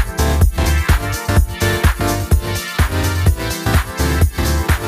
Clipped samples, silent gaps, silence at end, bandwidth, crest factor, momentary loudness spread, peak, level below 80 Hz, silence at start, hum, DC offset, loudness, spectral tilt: under 0.1%; none; 0 s; 15.5 kHz; 14 dB; 3 LU; 0 dBFS; -18 dBFS; 0 s; none; under 0.1%; -17 LUFS; -5 dB/octave